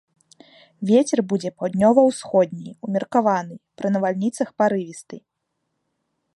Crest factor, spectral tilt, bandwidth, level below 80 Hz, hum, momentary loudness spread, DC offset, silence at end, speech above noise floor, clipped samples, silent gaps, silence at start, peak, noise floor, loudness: 20 dB; -6.5 dB/octave; 11.5 kHz; -68 dBFS; none; 17 LU; under 0.1%; 1.2 s; 56 dB; under 0.1%; none; 0.8 s; -2 dBFS; -76 dBFS; -21 LUFS